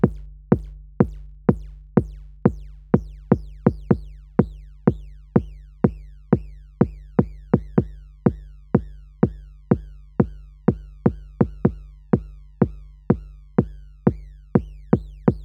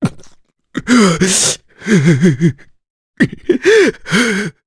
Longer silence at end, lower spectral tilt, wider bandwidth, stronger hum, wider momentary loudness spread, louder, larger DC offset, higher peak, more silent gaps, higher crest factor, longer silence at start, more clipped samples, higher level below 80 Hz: second, 0 s vs 0.15 s; first, -12 dB/octave vs -4.5 dB/octave; second, 4 kHz vs 11 kHz; neither; about the same, 10 LU vs 10 LU; second, -24 LUFS vs -12 LUFS; neither; about the same, 0 dBFS vs 0 dBFS; second, none vs 2.90-3.14 s; first, 22 dB vs 14 dB; about the same, 0 s vs 0 s; neither; first, -38 dBFS vs -46 dBFS